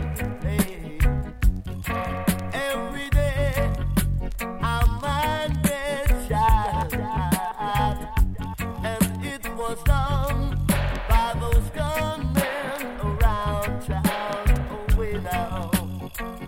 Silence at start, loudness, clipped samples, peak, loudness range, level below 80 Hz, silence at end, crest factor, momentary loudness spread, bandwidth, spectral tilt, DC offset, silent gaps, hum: 0 s; -25 LUFS; under 0.1%; -6 dBFS; 2 LU; -26 dBFS; 0 s; 18 dB; 6 LU; 17 kHz; -5.5 dB/octave; under 0.1%; none; none